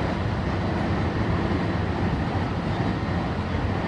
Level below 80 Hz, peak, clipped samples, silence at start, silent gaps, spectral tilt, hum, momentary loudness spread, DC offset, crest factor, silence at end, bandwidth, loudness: -34 dBFS; -12 dBFS; under 0.1%; 0 s; none; -7.5 dB/octave; none; 2 LU; under 0.1%; 14 dB; 0 s; 9.6 kHz; -26 LUFS